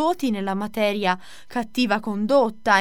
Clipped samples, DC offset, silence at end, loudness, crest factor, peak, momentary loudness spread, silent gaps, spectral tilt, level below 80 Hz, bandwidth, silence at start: under 0.1%; 1%; 0 s; -23 LUFS; 18 dB; -4 dBFS; 9 LU; none; -5 dB/octave; -58 dBFS; 17.5 kHz; 0 s